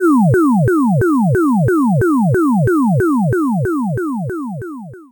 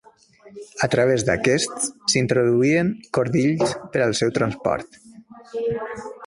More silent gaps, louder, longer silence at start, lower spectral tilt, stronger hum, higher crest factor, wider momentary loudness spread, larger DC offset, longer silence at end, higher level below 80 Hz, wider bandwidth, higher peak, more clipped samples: neither; first, -14 LUFS vs -21 LUFS; second, 0 s vs 0.45 s; first, -9.5 dB/octave vs -4.5 dB/octave; neither; second, 8 dB vs 18 dB; about the same, 11 LU vs 10 LU; neither; about the same, 0.1 s vs 0 s; first, -42 dBFS vs -54 dBFS; first, 19.5 kHz vs 11.5 kHz; about the same, -6 dBFS vs -4 dBFS; neither